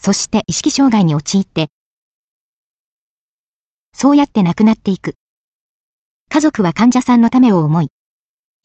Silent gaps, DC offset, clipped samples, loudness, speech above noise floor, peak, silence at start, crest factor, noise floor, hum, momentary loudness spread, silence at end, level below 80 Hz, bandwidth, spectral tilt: 1.70-3.92 s, 5.15-6.26 s; under 0.1%; under 0.1%; -13 LUFS; over 78 dB; -2 dBFS; 0.05 s; 14 dB; under -90 dBFS; none; 9 LU; 0.75 s; -50 dBFS; 8.8 kHz; -5.5 dB/octave